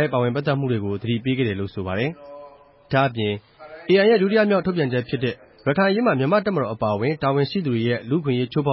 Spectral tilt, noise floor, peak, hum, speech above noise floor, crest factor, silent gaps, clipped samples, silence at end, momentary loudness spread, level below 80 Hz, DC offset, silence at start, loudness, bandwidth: -11.5 dB/octave; -46 dBFS; -6 dBFS; none; 26 dB; 16 dB; none; under 0.1%; 0 s; 9 LU; -52 dBFS; under 0.1%; 0 s; -21 LUFS; 5.8 kHz